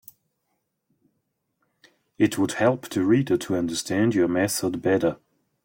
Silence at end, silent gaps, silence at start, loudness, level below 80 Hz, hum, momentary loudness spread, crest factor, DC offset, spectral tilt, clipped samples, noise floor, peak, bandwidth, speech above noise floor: 0.5 s; none; 2.2 s; -23 LUFS; -62 dBFS; none; 5 LU; 18 dB; under 0.1%; -5.5 dB/octave; under 0.1%; -76 dBFS; -8 dBFS; 16.5 kHz; 54 dB